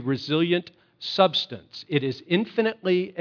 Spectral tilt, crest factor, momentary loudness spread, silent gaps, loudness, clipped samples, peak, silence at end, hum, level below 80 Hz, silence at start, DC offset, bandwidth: -6.5 dB/octave; 22 dB; 10 LU; none; -24 LUFS; under 0.1%; -4 dBFS; 0 s; none; -74 dBFS; 0 s; under 0.1%; 5.4 kHz